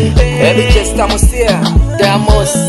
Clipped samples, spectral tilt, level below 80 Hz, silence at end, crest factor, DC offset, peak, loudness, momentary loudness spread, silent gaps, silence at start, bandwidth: 0.4%; -5 dB/octave; -14 dBFS; 0 s; 10 dB; under 0.1%; 0 dBFS; -10 LUFS; 2 LU; none; 0 s; 12.5 kHz